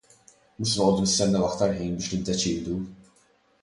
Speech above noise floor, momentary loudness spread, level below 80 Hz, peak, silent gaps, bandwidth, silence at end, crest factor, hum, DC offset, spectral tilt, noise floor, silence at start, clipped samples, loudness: 38 dB; 10 LU; -50 dBFS; -8 dBFS; none; 11.5 kHz; 0.65 s; 18 dB; none; under 0.1%; -4.5 dB/octave; -63 dBFS; 0.6 s; under 0.1%; -25 LUFS